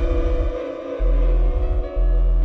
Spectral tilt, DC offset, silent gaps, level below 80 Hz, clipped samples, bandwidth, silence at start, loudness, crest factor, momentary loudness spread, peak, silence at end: -9 dB/octave; under 0.1%; none; -18 dBFS; under 0.1%; 3.9 kHz; 0 s; -23 LUFS; 8 dB; 5 LU; -10 dBFS; 0 s